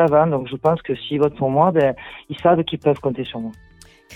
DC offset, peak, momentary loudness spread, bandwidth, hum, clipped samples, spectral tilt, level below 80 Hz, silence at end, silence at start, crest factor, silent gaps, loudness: under 0.1%; -2 dBFS; 14 LU; 10.5 kHz; none; under 0.1%; -8 dB/octave; -52 dBFS; 0 s; 0 s; 16 dB; none; -19 LUFS